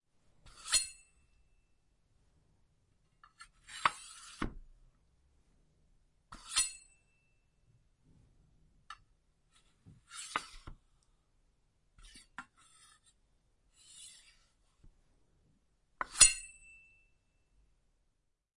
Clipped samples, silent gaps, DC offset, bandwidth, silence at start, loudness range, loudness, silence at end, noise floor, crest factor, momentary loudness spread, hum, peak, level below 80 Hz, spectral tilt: under 0.1%; none; under 0.1%; 11.5 kHz; 0.45 s; 25 LU; -31 LUFS; 2.1 s; -79 dBFS; 34 dB; 31 LU; none; -8 dBFS; -58 dBFS; 1 dB/octave